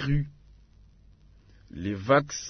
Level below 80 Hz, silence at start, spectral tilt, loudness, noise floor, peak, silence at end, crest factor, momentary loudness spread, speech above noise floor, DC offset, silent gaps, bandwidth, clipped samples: -46 dBFS; 0 s; -5.5 dB/octave; -28 LUFS; -56 dBFS; -8 dBFS; 0 s; 22 dB; 16 LU; 29 dB; under 0.1%; none; 6.6 kHz; under 0.1%